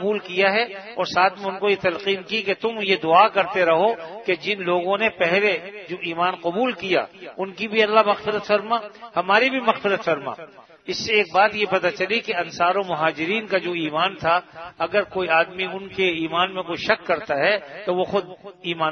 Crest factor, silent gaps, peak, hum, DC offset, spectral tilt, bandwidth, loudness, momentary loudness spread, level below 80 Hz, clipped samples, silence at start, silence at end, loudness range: 22 dB; none; 0 dBFS; none; under 0.1%; -4.5 dB/octave; 6.6 kHz; -21 LUFS; 10 LU; -64 dBFS; under 0.1%; 0 s; 0 s; 3 LU